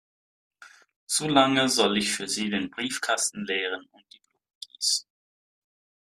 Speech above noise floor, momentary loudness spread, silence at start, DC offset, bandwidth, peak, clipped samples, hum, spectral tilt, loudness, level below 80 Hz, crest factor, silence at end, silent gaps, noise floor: over 64 dB; 10 LU; 0.6 s; under 0.1%; 14.5 kHz; -4 dBFS; under 0.1%; none; -2.5 dB/octave; -25 LUFS; -68 dBFS; 24 dB; 1.1 s; 0.96-1.07 s, 4.55-4.61 s; under -90 dBFS